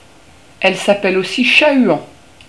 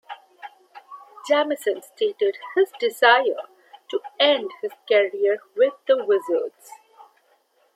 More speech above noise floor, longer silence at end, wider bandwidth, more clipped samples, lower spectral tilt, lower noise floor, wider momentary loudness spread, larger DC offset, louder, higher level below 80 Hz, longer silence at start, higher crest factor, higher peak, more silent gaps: second, 32 dB vs 42 dB; second, 0.45 s vs 1.25 s; second, 11 kHz vs 15.5 kHz; neither; first, -4 dB/octave vs -2 dB/octave; second, -44 dBFS vs -63 dBFS; second, 7 LU vs 21 LU; first, 0.4% vs under 0.1%; first, -13 LUFS vs -22 LUFS; first, -56 dBFS vs -88 dBFS; first, 0.6 s vs 0.1 s; about the same, 16 dB vs 20 dB; about the same, 0 dBFS vs -2 dBFS; neither